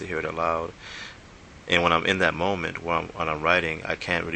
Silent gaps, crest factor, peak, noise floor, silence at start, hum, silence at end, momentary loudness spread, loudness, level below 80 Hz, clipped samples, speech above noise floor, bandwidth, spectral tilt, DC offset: none; 24 dB; -2 dBFS; -47 dBFS; 0 s; none; 0 s; 17 LU; -24 LUFS; -50 dBFS; under 0.1%; 21 dB; 9 kHz; -4.5 dB/octave; under 0.1%